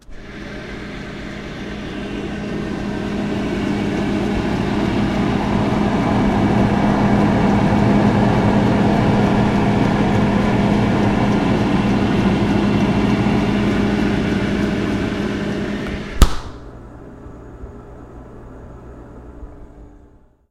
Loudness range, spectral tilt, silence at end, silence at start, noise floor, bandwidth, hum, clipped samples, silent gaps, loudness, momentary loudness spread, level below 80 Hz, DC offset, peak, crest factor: 11 LU; -7 dB/octave; 0.6 s; 0.1 s; -48 dBFS; 14 kHz; none; under 0.1%; none; -18 LUFS; 22 LU; -30 dBFS; under 0.1%; 0 dBFS; 18 dB